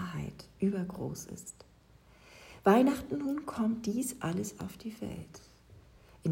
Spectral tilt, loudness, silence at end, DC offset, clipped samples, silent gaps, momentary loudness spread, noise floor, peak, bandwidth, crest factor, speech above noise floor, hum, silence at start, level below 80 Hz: -6 dB/octave; -33 LUFS; 0 s; under 0.1%; under 0.1%; none; 20 LU; -60 dBFS; -12 dBFS; 16 kHz; 22 dB; 28 dB; none; 0 s; -62 dBFS